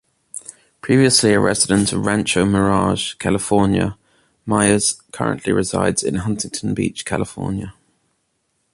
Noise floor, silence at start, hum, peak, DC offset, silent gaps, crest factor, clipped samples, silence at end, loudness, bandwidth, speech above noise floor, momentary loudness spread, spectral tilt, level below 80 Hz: -69 dBFS; 0.35 s; none; 0 dBFS; under 0.1%; none; 18 dB; under 0.1%; 1.05 s; -18 LUFS; 11.5 kHz; 51 dB; 13 LU; -4.5 dB/octave; -42 dBFS